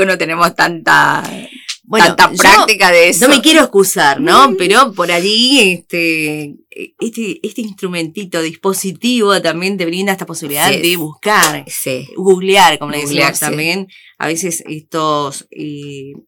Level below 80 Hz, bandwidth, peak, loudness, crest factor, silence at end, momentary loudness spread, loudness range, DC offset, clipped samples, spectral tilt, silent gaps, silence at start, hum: -48 dBFS; over 20 kHz; 0 dBFS; -11 LUFS; 12 dB; 0.1 s; 16 LU; 9 LU; under 0.1%; under 0.1%; -2.5 dB/octave; none; 0 s; none